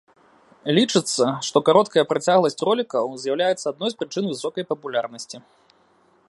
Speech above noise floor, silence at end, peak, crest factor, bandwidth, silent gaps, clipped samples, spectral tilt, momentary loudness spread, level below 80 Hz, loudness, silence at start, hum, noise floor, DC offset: 38 dB; 0.9 s; -2 dBFS; 20 dB; 11.5 kHz; none; under 0.1%; -4 dB/octave; 11 LU; -72 dBFS; -21 LUFS; 0.65 s; none; -59 dBFS; under 0.1%